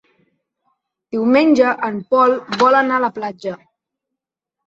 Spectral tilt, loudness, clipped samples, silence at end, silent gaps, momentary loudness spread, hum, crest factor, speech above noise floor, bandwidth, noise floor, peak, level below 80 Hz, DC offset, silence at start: -5.5 dB/octave; -16 LUFS; under 0.1%; 1.1 s; none; 14 LU; none; 16 dB; 67 dB; 7.8 kHz; -83 dBFS; -2 dBFS; -64 dBFS; under 0.1%; 1.15 s